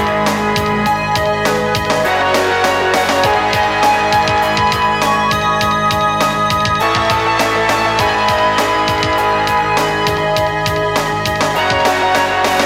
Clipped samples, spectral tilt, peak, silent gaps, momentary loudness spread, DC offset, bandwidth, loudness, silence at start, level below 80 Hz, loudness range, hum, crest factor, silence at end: under 0.1%; -4 dB/octave; 0 dBFS; none; 2 LU; under 0.1%; 16.5 kHz; -14 LUFS; 0 s; -36 dBFS; 1 LU; none; 14 dB; 0 s